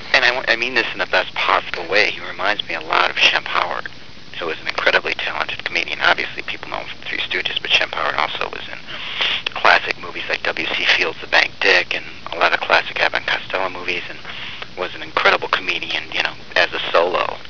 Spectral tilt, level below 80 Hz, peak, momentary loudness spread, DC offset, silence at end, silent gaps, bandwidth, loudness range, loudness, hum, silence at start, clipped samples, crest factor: -2 dB/octave; -52 dBFS; 0 dBFS; 13 LU; 2%; 0 s; none; 5.4 kHz; 4 LU; -18 LUFS; none; 0 s; under 0.1%; 20 dB